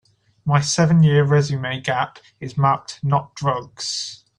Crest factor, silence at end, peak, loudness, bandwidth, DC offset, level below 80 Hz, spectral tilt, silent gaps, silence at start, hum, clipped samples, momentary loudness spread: 16 dB; 0.25 s; -4 dBFS; -20 LUFS; 10.5 kHz; under 0.1%; -54 dBFS; -5.5 dB/octave; none; 0.45 s; none; under 0.1%; 12 LU